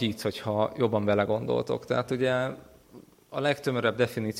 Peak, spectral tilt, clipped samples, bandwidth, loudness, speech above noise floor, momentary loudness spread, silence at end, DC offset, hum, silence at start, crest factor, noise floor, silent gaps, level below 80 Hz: -10 dBFS; -6 dB/octave; under 0.1%; 16.5 kHz; -28 LUFS; 25 dB; 6 LU; 0 s; under 0.1%; none; 0 s; 18 dB; -53 dBFS; none; -62 dBFS